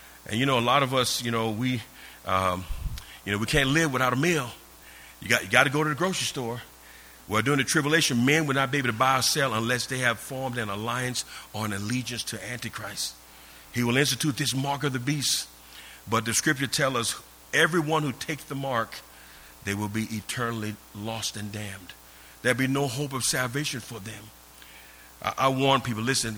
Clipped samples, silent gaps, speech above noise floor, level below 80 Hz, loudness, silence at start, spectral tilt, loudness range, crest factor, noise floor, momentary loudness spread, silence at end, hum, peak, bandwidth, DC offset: under 0.1%; none; 23 dB; -50 dBFS; -26 LUFS; 0 s; -3.5 dB/octave; 7 LU; 26 dB; -49 dBFS; 17 LU; 0 s; none; -2 dBFS; over 20 kHz; under 0.1%